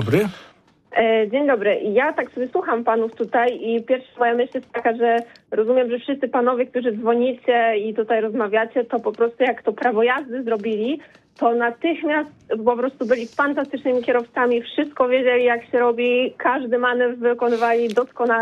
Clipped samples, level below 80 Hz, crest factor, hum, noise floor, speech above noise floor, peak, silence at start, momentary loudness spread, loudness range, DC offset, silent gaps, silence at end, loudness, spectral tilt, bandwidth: under 0.1%; -66 dBFS; 14 dB; none; -51 dBFS; 31 dB; -6 dBFS; 0 s; 5 LU; 2 LU; under 0.1%; none; 0 s; -20 LUFS; -6.5 dB/octave; 7 kHz